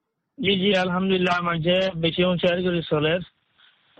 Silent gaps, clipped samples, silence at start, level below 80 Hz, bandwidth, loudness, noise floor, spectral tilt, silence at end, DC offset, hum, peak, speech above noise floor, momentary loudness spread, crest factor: none; under 0.1%; 0.4 s; -52 dBFS; 8.4 kHz; -22 LUFS; -60 dBFS; -6.5 dB/octave; 0.75 s; under 0.1%; none; -8 dBFS; 38 dB; 4 LU; 14 dB